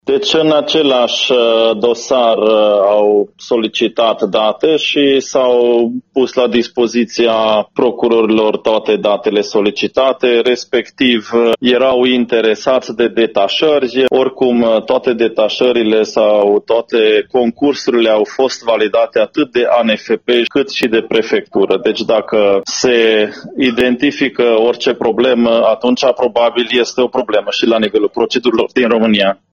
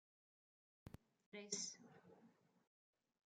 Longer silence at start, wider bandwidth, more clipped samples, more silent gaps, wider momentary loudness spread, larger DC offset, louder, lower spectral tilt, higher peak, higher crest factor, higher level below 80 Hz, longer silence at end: second, 0.05 s vs 0.85 s; second, 7.2 kHz vs 10.5 kHz; neither; second, none vs 1.26-1.32 s; second, 4 LU vs 20 LU; neither; first, -12 LUFS vs -50 LUFS; first, -4 dB/octave vs -1.5 dB/octave; first, 0 dBFS vs -30 dBFS; second, 12 dB vs 28 dB; first, -54 dBFS vs -82 dBFS; second, 0.2 s vs 0.9 s